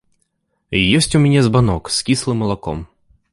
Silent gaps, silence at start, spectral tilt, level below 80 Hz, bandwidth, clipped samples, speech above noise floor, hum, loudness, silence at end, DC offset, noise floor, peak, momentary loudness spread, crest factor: none; 0.7 s; -5 dB/octave; -38 dBFS; 11.5 kHz; under 0.1%; 53 dB; none; -16 LUFS; 0.45 s; under 0.1%; -68 dBFS; -2 dBFS; 10 LU; 16 dB